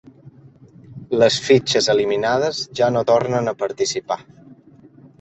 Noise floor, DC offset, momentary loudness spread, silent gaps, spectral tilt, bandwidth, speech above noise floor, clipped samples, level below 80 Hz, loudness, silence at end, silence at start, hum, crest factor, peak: -47 dBFS; under 0.1%; 9 LU; none; -4 dB/octave; 8.2 kHz; 29 dB; under 0.1%; -58 dBFS; -19 LUFS; 0.65 s; 0.25 s; none; 18 dB; -2 dBFS